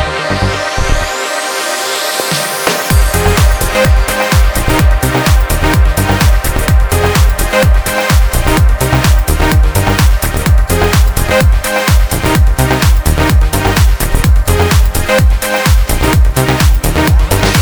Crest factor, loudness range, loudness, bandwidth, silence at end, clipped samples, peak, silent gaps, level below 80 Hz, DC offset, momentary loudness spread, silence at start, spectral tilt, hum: 10 dB; 1 LU; -11 LUFS; over 20 kHz; 0 s; under 0.1%; 0 dBFS; none; -12 dBFS; under 0.1%; 3 LU; 0 s; -4.5 dB/octave; none